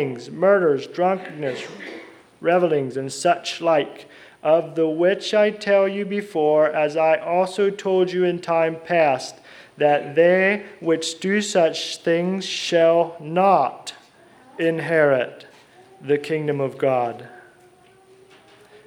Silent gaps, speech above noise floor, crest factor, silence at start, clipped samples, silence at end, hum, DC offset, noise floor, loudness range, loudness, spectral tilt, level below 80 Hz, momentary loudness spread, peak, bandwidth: none; 32 dB; 18 dB; 0 s; under 0.1%; 1.45 s; none; under 0.1%; -52 dBFS; 4 LU; -20 LUFS; -5 dB/octave; -74 dBFS; 11 LU; -4 dBFS; 12.5 kHz